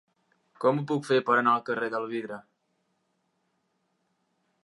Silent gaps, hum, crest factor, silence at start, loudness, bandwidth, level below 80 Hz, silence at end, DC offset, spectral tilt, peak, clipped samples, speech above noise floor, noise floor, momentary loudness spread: none; none; 20 dB; 0.6 s; -27 LUFS; 11.5 kHz; -84 dBFS; 2.25 s; under 0.1%; -6.5 dB/octave; -10 dBFS; under 0.1%; 49 dB; -75 dBFS; 12 LU